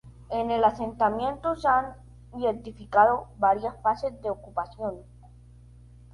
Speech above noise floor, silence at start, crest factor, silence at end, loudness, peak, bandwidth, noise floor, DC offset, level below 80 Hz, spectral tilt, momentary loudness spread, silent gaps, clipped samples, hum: 24 dB; 0.05 s; 20 dB; 1.1 s; -26 LUFS; -6 dBFS; 11 kHz; -50 dBFS; under 0.1%; -50 dBFS; -6.5 dB/octave; 13 LU; none; under 0.1%; 60 Hz at -45 dBFS